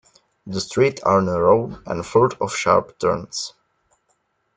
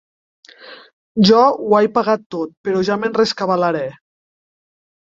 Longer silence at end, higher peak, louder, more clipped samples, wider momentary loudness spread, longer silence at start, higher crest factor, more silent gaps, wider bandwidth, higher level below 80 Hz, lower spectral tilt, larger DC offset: about the same, 1.1 s vs 1.2 s; about the same, -2 dBFS vs -2 dBFS; second, -20 LUFS vs -16 LUFS; neither; about the same, 12 LU vs 12 LU; second, 0.45 s vs 0.65 s; about the same, 20 dB vs 18 dB; second, none vs 0.93-1.15 s, 2.26-2.30 s, 2.57-2.64 s; first, 9.4 kHz vs 7.6 kHz; about the same, -54 dBFS vs -58 dBFS; about the same, -5 dB/octave vs -6 dB/octave; neither